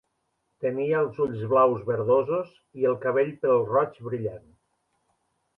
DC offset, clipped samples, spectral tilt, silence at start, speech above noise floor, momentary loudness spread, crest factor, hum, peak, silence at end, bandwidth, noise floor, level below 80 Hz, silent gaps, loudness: under 0.1%; under 0.1%; -10 dB/octave; 0.6 s; 51 dB; 10 LU; 18 dB; none; -8 dBFS; 1.2 s; 3.8 kHz; -76 dBFS; -66 dBFS; none; -25 LUFS